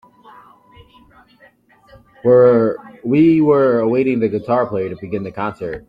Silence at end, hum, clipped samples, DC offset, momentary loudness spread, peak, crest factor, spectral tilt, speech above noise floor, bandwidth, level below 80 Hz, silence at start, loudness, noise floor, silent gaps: 0.1 s; none; under 0.1%; under 0.1%; 13 LU; -2 dBFS; 14 dB; -10 dB/octave; 32 dB; 5 kHz; -52 dBFS; 2.25 s; -16 LUFS; -47 dBFS; none